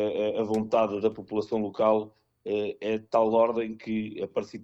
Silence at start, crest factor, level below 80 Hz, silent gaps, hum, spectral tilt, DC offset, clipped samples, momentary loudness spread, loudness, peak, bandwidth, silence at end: 0 s; 18 dB; -66 dBFS; none; none; -7 dB/octave; under 0.1%; under 0.1%; 9 LU; -28 LUFS; -10 dBFS; 8.4 kHz; 0 s